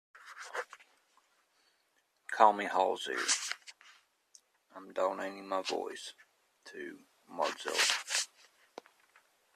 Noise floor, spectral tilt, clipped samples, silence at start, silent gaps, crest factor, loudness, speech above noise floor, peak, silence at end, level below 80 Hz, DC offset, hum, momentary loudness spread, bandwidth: -75 dBFS; 0 dB/octave; under 0.1%; 0.15 s; none; 28 dB; -33 LUFS; 43 dB; -8 dBFS; 1.3 s; -88 dBFS; under 0.1%; none; 26 LU; 14 kHz